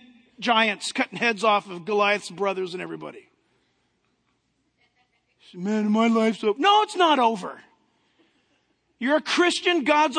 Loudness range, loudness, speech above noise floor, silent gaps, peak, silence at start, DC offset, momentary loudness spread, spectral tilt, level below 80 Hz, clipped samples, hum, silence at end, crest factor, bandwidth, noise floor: 11 LU; -22 LUFS; 49 dB; none; -6 dBFS; 0.4 s; under 0.1%; 13 LU; -3.5 dB/octave; -78 dBFS; under 0.1%; none; 0 s; 20 dB; 10 kHz; -71 dBFS